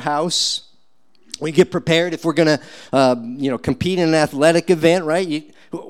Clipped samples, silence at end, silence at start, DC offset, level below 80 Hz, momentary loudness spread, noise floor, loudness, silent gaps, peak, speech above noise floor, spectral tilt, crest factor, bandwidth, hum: under 0.1%; 0 s; 0 s; 0.4%; -52 dBFS; 10 LU; -63 dBFS; -18 LUFS; none; -2 dBFS; 46 dB; -4.5 dB/octave; 16 dB; 15.5 kHz; none